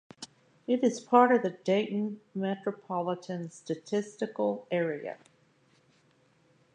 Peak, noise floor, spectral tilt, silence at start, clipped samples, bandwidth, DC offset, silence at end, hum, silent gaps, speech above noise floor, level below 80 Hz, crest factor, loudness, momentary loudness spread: -8 dBFS; -66 dBFS; -6 dB/octave; 0.2 s; under 0.1%; 10 kHz; under 0.1%; 1.6 s; none; none; 37 dB; -84 dBFS; 24 dB; -30 LUFS; 18 LU